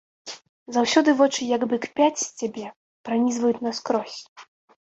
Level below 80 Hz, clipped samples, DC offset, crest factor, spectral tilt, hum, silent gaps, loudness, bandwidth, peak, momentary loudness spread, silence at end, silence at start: -70 dBFS; under 0.1%; under 0.1%; 20 dB; -3 dB/octave; none; 0.49-0.66 s, 2.76-3.04 s, 4.29-4.36 s; -23 LUFS; 8.2 kHz; -6 dBFS; 20 LU; 0.55 s; 0.25 s